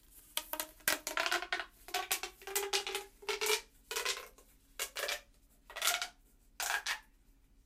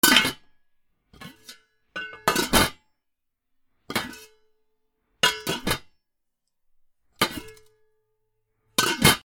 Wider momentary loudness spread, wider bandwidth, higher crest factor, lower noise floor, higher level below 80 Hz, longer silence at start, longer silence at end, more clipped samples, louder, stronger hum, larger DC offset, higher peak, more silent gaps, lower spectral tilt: second, 9 LU vs 24 LU; second, 16 kHz vs over 20 kHz; about the same, 26 dB vs 28 dB; second, -65 dBFS vs -78 dBFS; second, -66 dBFS vs -46 dBFS; about the same, 0.1 s vs 0.05 s; first, 0.65 s vs 0.05 s; neither; second, -37 LUFS vs -23 LUFS; neither; neither; second, -12 dBFS vs 0 dBFS; neither; second, 1 dB/octave vs -2 dB/octave